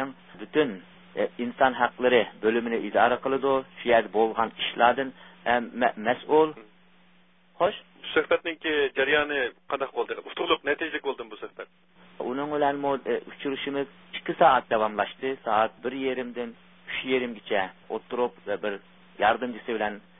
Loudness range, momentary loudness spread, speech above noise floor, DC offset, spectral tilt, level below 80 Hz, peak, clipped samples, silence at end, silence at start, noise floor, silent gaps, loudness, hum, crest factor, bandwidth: 6 LU; 12 LU; 35 dB; under 0.1%; -8.5 dB/octave; -64 dBFS; -6 dBFS; under 0.1%; 0.2 s; 0 s; -61 dBFS; none; -26 LUFS; none; 22 dB; 3.9 kHz